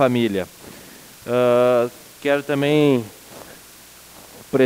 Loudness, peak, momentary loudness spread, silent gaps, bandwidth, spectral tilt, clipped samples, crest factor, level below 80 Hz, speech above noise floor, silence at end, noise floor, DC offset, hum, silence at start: -19 LUFS; -4 dBFS; 24 LU; none; 16 kHz; -6 dB/octave; under 0.1%; 16 dB; -60 dBFS; 27 dB; 0 s; -44 dBFS; under 0.1%; none; 0 s